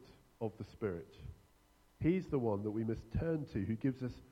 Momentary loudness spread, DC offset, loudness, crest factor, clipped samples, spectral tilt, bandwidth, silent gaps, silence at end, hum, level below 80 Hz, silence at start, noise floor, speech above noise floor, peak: 11 LU; under 0.1%; -39 LUFS; 18 dB; under 0.1%; -9.5 dB/octave; 12.5 kHz; none; 0.05 s; none; -56 dBFS; 0 s; -69 dBFS; 31 dB; -22 dBFS